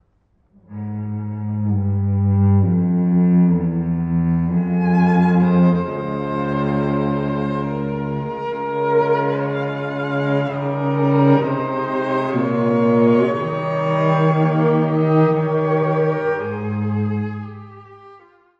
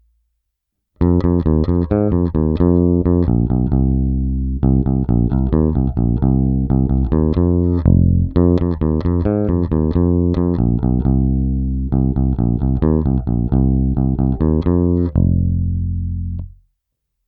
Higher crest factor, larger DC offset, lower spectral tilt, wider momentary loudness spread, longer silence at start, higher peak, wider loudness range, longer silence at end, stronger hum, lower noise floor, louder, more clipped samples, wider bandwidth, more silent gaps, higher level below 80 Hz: about the same, 14 dB vs 16 dB; neither; second, -10 dB/octave vs -13 dB/octave; first, 10 LU vs 4 LU; second, 0.7 s vs 1 s; second, -4 dBFS vs 0 dBFS; about the same, 4 LU vs 2 LU; second, 0.45 s vs 0.8 s; neither; second, -61 dBFS vs -75 dBFS; about the same, -19 LUFS vs -17 LUFS; neither; first, 5.2 kHz vs 4.5 kHz; neither; second, -48 dBFS vs -22 dBFS